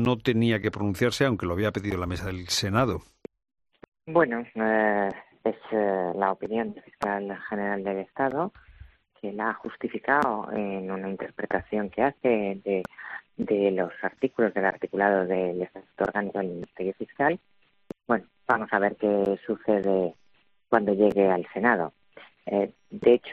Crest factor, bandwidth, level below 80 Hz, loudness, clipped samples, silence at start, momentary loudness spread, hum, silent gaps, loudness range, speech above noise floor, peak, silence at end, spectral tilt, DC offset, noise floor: 22 dB; 13.5 kHz; -58 dBFS; -27 LUFS; under 0.1%; 0 s; 10 LU; none; 3.88-3.92 s; 4 LU; 40 dB; -4 dBFS; 0 s; -6 dB/octave; under 0.1%; -66 dBFS